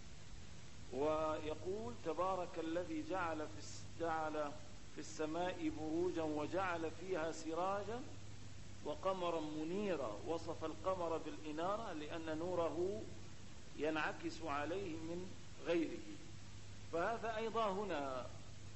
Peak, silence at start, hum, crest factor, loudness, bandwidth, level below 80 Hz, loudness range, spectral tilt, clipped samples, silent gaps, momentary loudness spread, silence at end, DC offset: -26 dBFS; 0 s; none; 18 dB; -43 LUFS; 8.2 kHz; -64 dBFS; 2 LU; -5.5 dB/octave; under 0.1%; none; 15 LU; 0 s; 0.3%